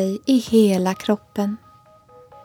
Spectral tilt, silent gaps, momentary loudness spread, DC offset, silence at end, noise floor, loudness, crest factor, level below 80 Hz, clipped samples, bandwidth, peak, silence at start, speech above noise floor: -6 dB/octave; none; 10 LU; under 0.1%; 0.9 s; -50 dBFS; -20 LUFS; 16 dB; -58 dBFS; under 0.1%; 18 kHz; -4 dBFS; 0 s; 31 dB